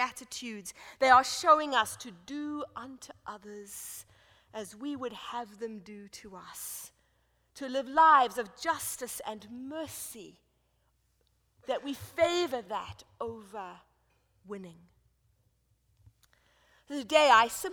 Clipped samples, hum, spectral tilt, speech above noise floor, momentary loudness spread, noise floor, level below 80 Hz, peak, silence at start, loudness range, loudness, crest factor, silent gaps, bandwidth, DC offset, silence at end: under 0.1%; none; -2 dB/octave; 42 dB; 23 LU; -73 dBFS; -68 dBFS; -8 dBFS; 0 s; 14 LU; -29 LUFS; 24 dB; none; over 20 kHz; under 0.1%; 0 s